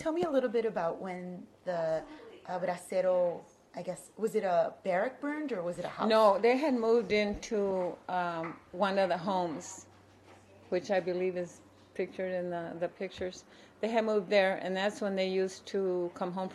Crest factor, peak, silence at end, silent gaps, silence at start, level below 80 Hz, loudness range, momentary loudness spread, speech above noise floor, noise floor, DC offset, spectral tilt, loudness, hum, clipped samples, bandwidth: 18 dB; -14 dBFS; 0 s; none; 0 s; -66 dBFS; 7 LU; 14 LU; 26 dB; -58 dBFS; under 0.1%; -5.5 dB/octave; -32 LUFS; none; under 0.1%; 13 kHz